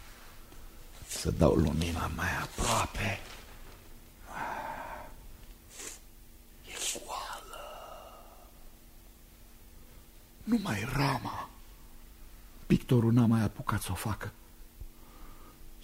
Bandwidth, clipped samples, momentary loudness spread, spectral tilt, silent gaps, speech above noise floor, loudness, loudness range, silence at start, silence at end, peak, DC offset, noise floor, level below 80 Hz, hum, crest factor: 16 kHz; under 0.1%; 27 LU; -5.5 dB/octave; none; 25 dB; -32 LUFS; 13 LU; 0 s; 0 s; -8 dBFS; under 0.1%; -54 dBFS; -46 dBFS; none; 26 dB